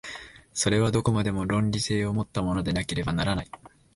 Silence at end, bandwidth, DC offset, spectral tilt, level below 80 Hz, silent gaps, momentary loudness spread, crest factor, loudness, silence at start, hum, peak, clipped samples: 0.3 s; 11.5 kHz; under 0.1%; -5 dB/octave; -44 dBFS; none; 11 LU; 18 dB; -26 LUFS; 0.05 s; none; -8 dBFS; under 0.1%